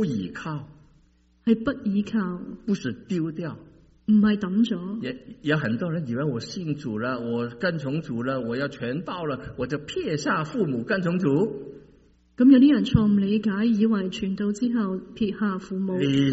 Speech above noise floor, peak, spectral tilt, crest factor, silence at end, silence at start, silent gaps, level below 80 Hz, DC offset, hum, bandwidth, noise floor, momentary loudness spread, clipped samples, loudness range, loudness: 36 dB; -4 dBFS; -6 dB/octave; 20 dB; 0 s; 0 s; none; -50 dBFS; under 0.1%; none; 8 kHz; -60 dBFS; 11 LU; under 0.1%; 7 LU; -25 LUFS